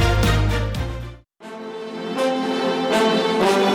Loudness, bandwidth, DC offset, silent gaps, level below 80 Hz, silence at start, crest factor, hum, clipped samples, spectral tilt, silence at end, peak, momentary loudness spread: -20 LUFS; 16 kHz; under 0.1%; none; -30 dBFS; 0 s; 14 dB; none; under 0.1%; -5.5 dB/octave; 0 s; -8 dBFS; 17 LU